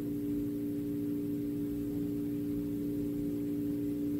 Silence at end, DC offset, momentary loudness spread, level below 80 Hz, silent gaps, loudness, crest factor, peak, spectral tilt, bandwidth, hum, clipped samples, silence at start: 0 s; under 0.1%; 1 LU; -56 dBFS; none; -35 LUFS; 10 dB; -24 dBFS; -8.5 dB/octave; 16 kHz; none; under 0.1%; 0 s